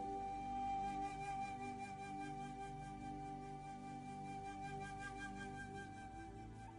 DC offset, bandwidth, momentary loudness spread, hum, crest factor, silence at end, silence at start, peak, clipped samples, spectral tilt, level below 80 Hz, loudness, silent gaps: under 0.1%; 11 kHz; 8 LU; 50 Hz at -70 dBFS; 12 dB; 0 s; 0 s; -36 dBFS; under 0.1%; -5.5 dB/octave; -62 dBFS; -48 LUFS; none